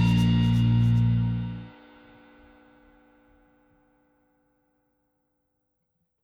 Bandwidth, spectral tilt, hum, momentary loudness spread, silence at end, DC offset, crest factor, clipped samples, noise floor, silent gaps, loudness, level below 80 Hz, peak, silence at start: 6.8 kHz; -8 dB/octave; none; 16 LU; 4.55 s; under 0.1%; 14 dB; under 0.1%; -77 dBFS; none; -23 LUFS; -42 dBFS; -12 dBFS; 0 s